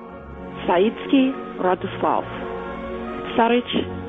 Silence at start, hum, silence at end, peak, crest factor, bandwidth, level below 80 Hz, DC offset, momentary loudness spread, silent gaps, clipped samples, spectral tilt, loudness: 0 s; none; 0 s; -6 dBFS; 18 dB; 3.9 kHz; -46 dBFS; under 0.1%; 11 LU; none; under 0.1%; -8.5 dB/octave; -22 LUFS